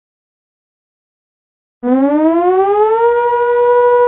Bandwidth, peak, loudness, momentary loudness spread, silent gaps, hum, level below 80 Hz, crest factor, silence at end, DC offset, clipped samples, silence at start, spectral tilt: 3.9 kHz; -2 dBFS; -12 LUFS; 3 LU; none; none; -54 dBFS; 12 dB; 0 s; under 0.1%; under 0.1%; 1.85 s; -10 dB/octave